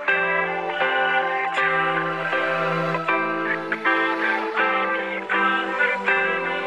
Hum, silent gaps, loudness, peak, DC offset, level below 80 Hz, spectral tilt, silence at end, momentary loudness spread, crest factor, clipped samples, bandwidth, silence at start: none; none; -21 LUFS; -8 dBFS; 0.1%; -68 dBFS; -5 dB/octave; 0 s; 3 LU; 16 dB; under 0.1%; 11.5 kHz; 0 s